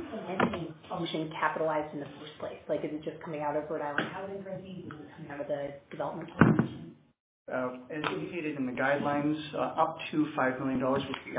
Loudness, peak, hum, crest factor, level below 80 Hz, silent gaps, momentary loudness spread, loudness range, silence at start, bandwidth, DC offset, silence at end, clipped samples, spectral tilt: -32 LUFS; -4 dBFS; none; 30 dB; -60 dBFS; 7.20-7.46 s; 13 LU; 6 LU; 0 s; 4 kHz; under 0.1%; 0 s; under 0.1%; -5 dB/octave